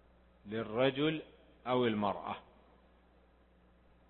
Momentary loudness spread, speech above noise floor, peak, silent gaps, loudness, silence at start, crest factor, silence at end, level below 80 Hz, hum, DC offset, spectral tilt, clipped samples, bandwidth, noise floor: 15 LU; 32 dB; -16 dBFS; none; -35 LUFS; 0.45 s; 22 dB; 1.7 s; -66 dBFS; none; under 0.1%; -4 dB/octave; under 0.1%; 4.2 kHz; -66 dBFS